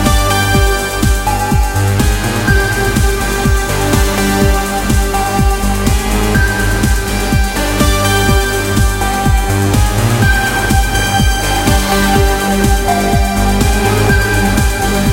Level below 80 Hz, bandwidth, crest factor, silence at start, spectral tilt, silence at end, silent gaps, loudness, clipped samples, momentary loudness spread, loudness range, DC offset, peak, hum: -16 dBFS; 17 kHz; 12 dB; 0 s; -4.5 dB/octave; 0 s; none; -12 LUFS; under 0.1%; 3 LU; 1 LU; under 0.1%; 0 dBFS; none